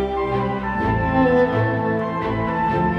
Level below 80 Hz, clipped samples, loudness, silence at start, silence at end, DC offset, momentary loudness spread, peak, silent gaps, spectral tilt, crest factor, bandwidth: -36 dBFS; under 0.1%; -20 LUFS; 0 s; 0 s; under 0.1%; 6 LU; -6 dBFS; none; -9 dB/octave; 14 dB; 6.6 kHz